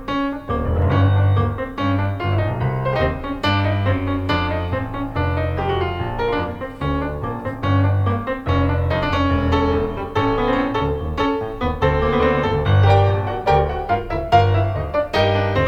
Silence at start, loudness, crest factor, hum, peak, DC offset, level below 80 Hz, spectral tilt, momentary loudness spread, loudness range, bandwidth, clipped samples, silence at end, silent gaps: 0 s; -20 LUFS; 16 dB; none; -2 dBFS; under 0.1%; -30 dBFS; -8 dB/octave; 7 LU; 4 LU; 6.6 kHz; under 0.1%; 0 s; none